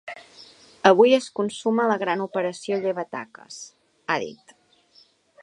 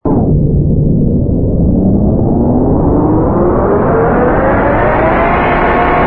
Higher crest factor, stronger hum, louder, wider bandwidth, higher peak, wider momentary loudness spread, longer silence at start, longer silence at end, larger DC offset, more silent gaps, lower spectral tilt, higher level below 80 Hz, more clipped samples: first, 24 dB vs 8 dB; neither; second, -22 LUFS vs -10 LUFS; first, 11 kHz vs 4.3 kHz; about the same, 0 dBFS vs 0 dBFS; first, 23 LU vs 1 LU; about the same, 0.05 s vs 0.05 s; first, 1.1 s vs 0 s; neither; neither; second, -4.5 dB/octave vs -12 dB/octave; second, -74 dBFS vs -18 dBFS; neither